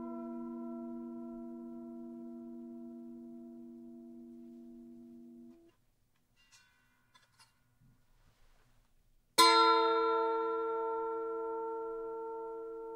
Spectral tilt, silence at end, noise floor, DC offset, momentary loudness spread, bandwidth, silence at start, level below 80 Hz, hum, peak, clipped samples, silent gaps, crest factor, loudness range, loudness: -1.5 dB/octave; 0 s; -75 dBFS; under 0.1%; 26 LU; 16 kHz; 0 s; -74 dBFS; none; -12 dBFS; under 0.1%; none; 26 dB; 23 LU; -32 LUFS